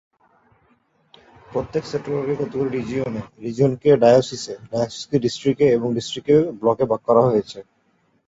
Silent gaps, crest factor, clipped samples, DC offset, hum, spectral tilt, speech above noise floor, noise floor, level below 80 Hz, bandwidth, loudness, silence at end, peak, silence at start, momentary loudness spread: none; 18 dB; under 0.1%; under 0.1%; none; -6.5 dB/octave; 44 dB; -64 dBFS; -54 dBFS; 8 kHz; -20 LUFS; 0.65 s; -2 dBFS; 1.5 s; 13 LU